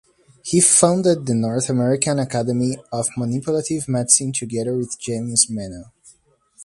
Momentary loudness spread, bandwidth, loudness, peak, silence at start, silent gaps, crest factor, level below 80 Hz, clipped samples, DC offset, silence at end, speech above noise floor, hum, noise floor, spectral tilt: 12 LU; 11.5 kHz; -18 LUFS; 0 dBFS; 0.45 s; none; 20 dB; -56 dBFS; under 0.1%; under 0.1%; 0 s; 36 dB; none; -55 dBFS; -4 dB/octave